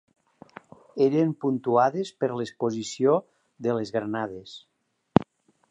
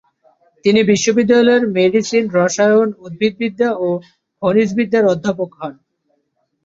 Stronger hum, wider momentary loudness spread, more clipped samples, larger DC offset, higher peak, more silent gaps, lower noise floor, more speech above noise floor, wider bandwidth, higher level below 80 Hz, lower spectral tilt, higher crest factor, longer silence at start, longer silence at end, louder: neither; first, 16 LU vs 9 LU; neither; neither; about the same, 0 dBFS vs -2 dBFS; neither; second, -49 dBFS vs -67 dBFS; second, 24 dB vs 52 dB; first, 10 kHz vs 7.8 kHz; about the same, -62 dBFS vs -58 dBFS; first, -6.5 dB/octave vs -5 dB/octave; first, 26 dB vs 14 dB; first, 0.95 s vs 0.65 s; second, 0.5 s vs 0.95 s; second, -26 LUFS vs -15 LUFS